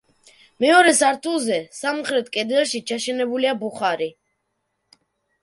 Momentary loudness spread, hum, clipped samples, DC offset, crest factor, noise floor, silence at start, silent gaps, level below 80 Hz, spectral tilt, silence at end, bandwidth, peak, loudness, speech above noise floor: 11 LU; none; under 0.1%; under 0.1%; 20 dB; -74 dBFS; 0.6 s; none; -72 dBFS; -2 dB/octave; 1.3 s; 11.5 kHz; -2 dBFS; -20 LUFS; 54 dB